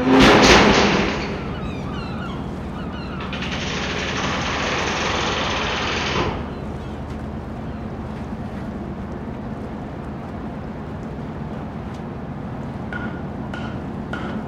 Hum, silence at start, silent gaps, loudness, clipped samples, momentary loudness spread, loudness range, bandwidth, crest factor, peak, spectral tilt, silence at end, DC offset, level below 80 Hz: none; 0 s; none; -22 LUFS; under 0.1%; 15 LU; 9 LU; 15.5 kHz; 22 dB; 0 dBFS; -4.5 dB/octave; 0 s; under 0.1%; -36 dBFS